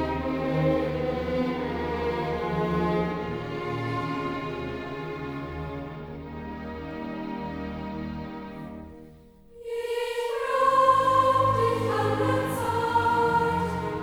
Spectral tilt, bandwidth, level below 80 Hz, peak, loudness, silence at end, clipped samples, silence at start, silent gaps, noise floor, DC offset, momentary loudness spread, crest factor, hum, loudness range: -6.5 dB/octave; over 20 kHz; -46 dBFS; -8 dBFS; -27 LUFS; 0 s; under 0.1%; 0 s; none; -51 dBFS; under 0.1%; 15 LU; 18 dB; none; 13 LU